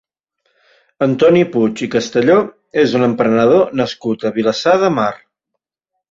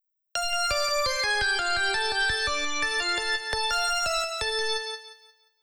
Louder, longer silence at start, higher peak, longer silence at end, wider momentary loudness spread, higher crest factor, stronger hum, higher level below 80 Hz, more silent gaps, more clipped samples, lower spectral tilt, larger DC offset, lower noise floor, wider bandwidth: first, -14 LUFS vs -25 LUFS; first, 1 s vs 0.35 s; first, -2 dBFS vs -14 dBFS; first, 0.95 s vs 0.3 s; first, 8 LU vs 5 LU; about the same, 14 dB vs 14 dB; neither; second, -56 dBFS vs -48 dBFS; neither; neither; first, -6 dB/octave vs 0 dB/octave; neither; first, -77 dBFS vs -57 dBFS; second, 7.8 kHz vs over 20 kHz